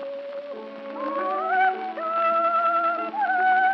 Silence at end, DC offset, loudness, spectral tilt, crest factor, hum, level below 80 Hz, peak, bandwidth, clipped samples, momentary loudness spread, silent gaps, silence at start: 0 s; under 0.1%; -23 LUFS; -5 dB/octave; 12 dB; none; under -90 dBFS; -12 dBFS; 5.8 kHz; under 0.1%; 14 LU; none; 0 s